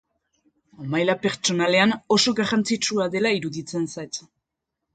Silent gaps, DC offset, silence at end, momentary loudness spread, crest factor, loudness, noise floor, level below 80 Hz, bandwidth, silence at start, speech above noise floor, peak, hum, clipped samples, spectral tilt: none; under 0.1%; 0.75 s; 12 LU; 20 dB; -22 LUFS; -83 dBFS; -64 dBFS; 9.4 kHz; 0.8 s; 60 dB; -4 dBFS; none; under 0.1%; -3.5 dB/octave